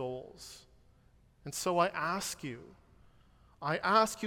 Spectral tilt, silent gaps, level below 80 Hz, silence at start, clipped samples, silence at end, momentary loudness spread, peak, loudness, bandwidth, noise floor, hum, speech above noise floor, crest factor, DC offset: -3.5 dB/octave; none; -66 dBFS; 0 s; under 0.1%; 0 s; 22 LU; -14 dBFS; -33 LUFS; 17 kHz; -64 dBFS; none; 32 dB; 22 dB; under 0.1%